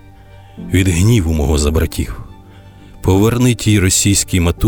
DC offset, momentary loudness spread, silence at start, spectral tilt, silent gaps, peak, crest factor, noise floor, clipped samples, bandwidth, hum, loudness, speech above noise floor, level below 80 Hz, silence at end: under 0.1%; 11 LU; 0.35 s; -5 dB/octave; none; -4 dBFS; 12 dB; -39 dBFS; under 0.1%; over 20 kHz; none; -14 LUFS; 26 dB; -26 dBFS; 0 s